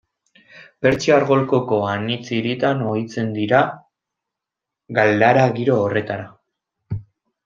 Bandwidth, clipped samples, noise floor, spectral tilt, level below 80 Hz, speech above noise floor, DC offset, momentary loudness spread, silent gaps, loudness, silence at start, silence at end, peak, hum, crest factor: 7.6 kHz; under 0.1%; -85 dBFS; -6.5 dB/octave; -58 dBFS; 67 dB; under 0.1%; 16 LU; none; -19 LUFS; 0.55 s; 0.45 s; -2 dBFS; none; 18 dB